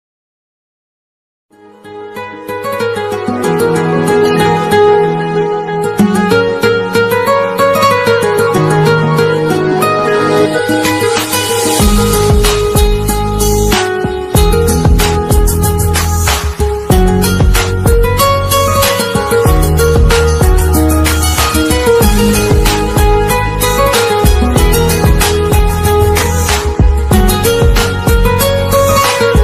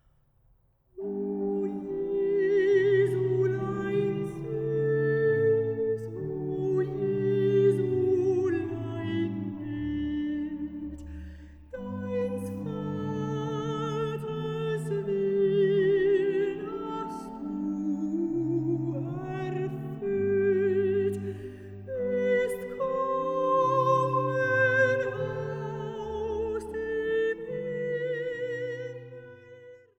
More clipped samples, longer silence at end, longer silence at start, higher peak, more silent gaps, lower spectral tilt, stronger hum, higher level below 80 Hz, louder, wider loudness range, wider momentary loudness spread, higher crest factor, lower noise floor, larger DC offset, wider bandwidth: neither; second, 0 s vs 0.2 s; first, 1.85 s vs 0.95 s; first, 0 dBFS vs -14 dBFS; neither; second, -5 dB/octave vs -8 dB/octave; neither; first, -16 dBFS vs -54 dBFS; first, -10 LUFS vs -28 LUFS; second, 2 LU vs 7 LU; second, 4 LU vs 12 LU; second, 10 dB vs 16 dB; second, -32 dBFS vs -65 dBFS; neither; first, 15.5 kHz vs 11.5 kHz